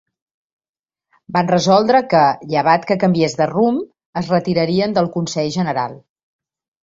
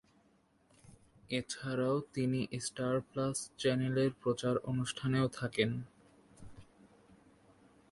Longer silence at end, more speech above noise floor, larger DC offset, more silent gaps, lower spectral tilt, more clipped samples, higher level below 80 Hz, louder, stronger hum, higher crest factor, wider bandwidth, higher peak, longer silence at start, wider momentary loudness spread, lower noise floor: second, 0.85 s vs 1.3 s; first, 47 dB vs 36 dB; neither; first, 4.06-4.13 s vs none; about the same, -6 dB/octave vs -5.5 dB/octave; neither; first, -56 dBFS vs -66 dBFS; first, -17 LUFS vs -35 LUFS; neither; second, 16 dB vs 22 dB; second, 7.8 kHz vs 11.5 kHz; first, -2 dBFS vs -16 dBFS; first, 1.3 s vs 0.85 s; first, 9 LU vs 6 LU; second, -63 dBFS vs -70 dBFS